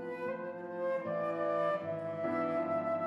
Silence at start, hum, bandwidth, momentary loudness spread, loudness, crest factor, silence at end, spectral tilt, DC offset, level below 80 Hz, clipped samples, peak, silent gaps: 0 s; none; 10 kHz; 6 LU; -35 LUFS; 14 dB; 0 s; -8 dB/octave; under 0.1%; -88 dBFS; under 0.1%; -22 dBFS; none